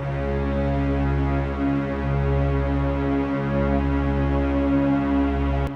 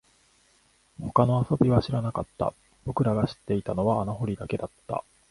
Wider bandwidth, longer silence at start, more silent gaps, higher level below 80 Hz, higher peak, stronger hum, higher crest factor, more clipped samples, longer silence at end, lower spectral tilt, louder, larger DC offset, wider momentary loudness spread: second, 6 kHz vs 11.5 kHz; second, 0 s vs 1 s; neither; first, -28 dBFS vs -50 dBFS; second, -10 dBFS vs -4 dBFS; neither; second, 12 dB vs 22 dB; neither; second, 0 s vs 0.3 s; about the same, -9.5 dB/octave vs -8.5 dB/octave; first, -23 LUFS vs -27 LUFS; neither; second, 3 LU vs 12 LU